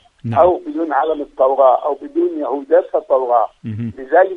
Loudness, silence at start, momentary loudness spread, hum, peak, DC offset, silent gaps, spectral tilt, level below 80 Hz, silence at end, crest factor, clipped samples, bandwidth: -16 LUFS; 0.25 s; 10 LU; none; 0 dBFS; under 0.1%; none; -9 dB/octave; -52 dBFS; 0 s; 16 dB; under 0.1%; 4 kHz